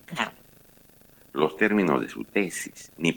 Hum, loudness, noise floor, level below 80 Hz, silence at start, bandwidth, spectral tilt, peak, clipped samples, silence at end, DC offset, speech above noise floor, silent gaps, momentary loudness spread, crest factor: none; -26 LUFS; -55 dBFS; -64 dBFS; 0.1 s; 19 kHz; -4.5 dB/octave; -8 dBFS; under 0.1%; 0 s; under 0.1%; 29 dB; none; 12 LU; 20 dB